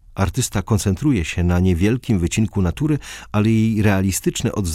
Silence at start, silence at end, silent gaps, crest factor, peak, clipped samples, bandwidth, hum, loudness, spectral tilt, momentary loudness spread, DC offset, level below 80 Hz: 0.15 s; 0 s; none; 14 dB; -4 dBFS; under 0.1%; 16 kHz; none; -19 LUFS; -6 dB/octave; 5 LU; under 0.1%; -34 dBFS